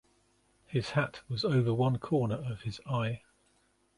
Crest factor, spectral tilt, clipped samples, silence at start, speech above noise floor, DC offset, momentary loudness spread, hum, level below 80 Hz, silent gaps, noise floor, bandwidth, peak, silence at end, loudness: 18 dB; -7.5 dB/octave; under 0.1%; 0.7 s; 40 dB; under 0.1%; 9 LU; none; -60 dBFS; none; -71 dBFS; 11 kHz; -14 dBFS; 0.8 s; -32 LUFS